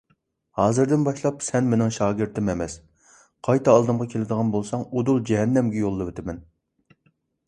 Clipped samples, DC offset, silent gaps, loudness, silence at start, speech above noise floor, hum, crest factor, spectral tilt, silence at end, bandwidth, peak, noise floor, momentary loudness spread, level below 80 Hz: under 0.1%; under 0.1%; none; -23 LUFS; 0.55 s; 46 dB; none; 22 dB; -7 dB/octave; 1.05 s; 11.5 kHz; -2 dBFS; -68 dBFS; 14 LU; -50 dBFS